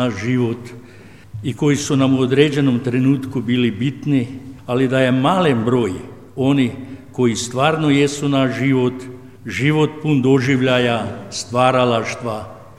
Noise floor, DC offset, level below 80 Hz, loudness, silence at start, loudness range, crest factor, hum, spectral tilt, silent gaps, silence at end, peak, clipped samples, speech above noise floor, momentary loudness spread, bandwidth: -41 dBFS; 0.4%; -54 dBFS; -17 LUFS; 0 s; 1 LU; 16 dB; none; -6 dB/octave; none; 0.15 s; 0 dBFS; under 0.1%; 25 dB; 14 LU; 12.5 kHz